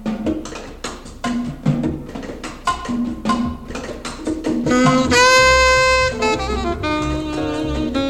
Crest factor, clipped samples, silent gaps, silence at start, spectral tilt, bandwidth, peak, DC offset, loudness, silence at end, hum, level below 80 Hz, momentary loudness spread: 16 dB; under 0.1%; none; 0 s; -4 dB/octave; 15 kHz; -4 dBFS; under 0.1%; -17 LUFS; 0 s; none; -32 dBFS; 18 LU